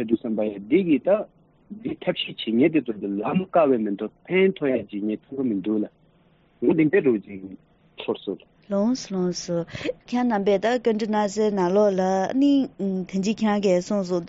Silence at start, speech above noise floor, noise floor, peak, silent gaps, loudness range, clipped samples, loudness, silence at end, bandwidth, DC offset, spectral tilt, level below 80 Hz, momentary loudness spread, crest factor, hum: 0 s; 37 dB; -59 dBFS; -8 dBFS; none; 4 LU; under 0.1%; -23 LUFS; 0 s; 8 kHz; under 0.1%; -5.5 dB/octave; -62 dBFS; 11 LU; 14 dB; none